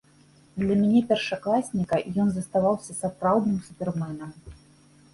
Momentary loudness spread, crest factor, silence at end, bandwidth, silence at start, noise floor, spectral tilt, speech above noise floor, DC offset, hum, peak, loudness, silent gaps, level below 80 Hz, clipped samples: 11 LU; 16 dB; 0.6 s; 11.5 kHz; 0.55 s; -57 dBFS; -6.5 dB/octave; 32 dB; under 0.1%; none; -10 dBFS; -25 LUFS; none; -56 dBFS; under 0.1%